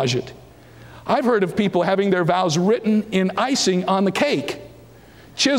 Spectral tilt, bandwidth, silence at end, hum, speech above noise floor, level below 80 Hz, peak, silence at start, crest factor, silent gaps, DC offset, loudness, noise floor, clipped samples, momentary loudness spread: -4.5 dB/octave; 16.5 kHz; 0 s; none; 26 dB; -56 dBFS; -6 dBFS; 0 s; 14 dB; none; under 0.1%; -20 LUFS; -45 dBFS; under 0.1%; 11 LU